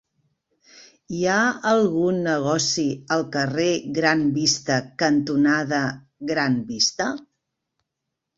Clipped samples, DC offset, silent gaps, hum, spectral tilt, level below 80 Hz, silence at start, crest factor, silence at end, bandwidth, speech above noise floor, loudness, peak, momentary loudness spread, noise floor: under 0.1%; under 0.1%; none; none; -4 dB/octave; -62 dBFS; 0.75 s; 20 dB; 1.15 s; 8 kHz; 60 dB; -21 LUFS; -2 dBFS; 7 LU; -82 dBFS